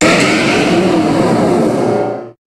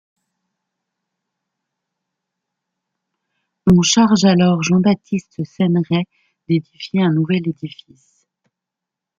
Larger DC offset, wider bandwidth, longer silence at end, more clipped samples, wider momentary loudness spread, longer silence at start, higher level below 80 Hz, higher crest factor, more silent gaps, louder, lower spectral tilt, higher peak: neither; first, 13.5 kHz vs 7.6 kHz; second, 0.15 s vs 1.5 s; neither; second, 5 LU vs 13 LU; second, 0 s vs 3.65 s; first, -42 dBFS vs -50 dBFS; second, 12 dB vs 18 dB; neither; first, -12 LUFS vs -16 LUFS; about the same, -5 dB/octave vs -5.5 dB/octave; about the same, 0 dBFS vs -2 dBFS